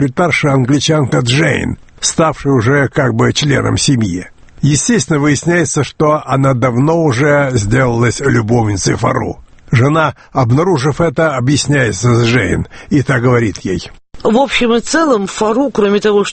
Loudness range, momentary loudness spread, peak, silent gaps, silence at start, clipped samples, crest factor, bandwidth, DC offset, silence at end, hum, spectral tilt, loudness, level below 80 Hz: 1 LU; 6 LU; 0 dBFS; none; 0 s; under 0.1%; 12 dB; 8.8 kHz; under 0.1%; 0 s; none; -5 dB/octave; -12 LUFS; -36 dBFS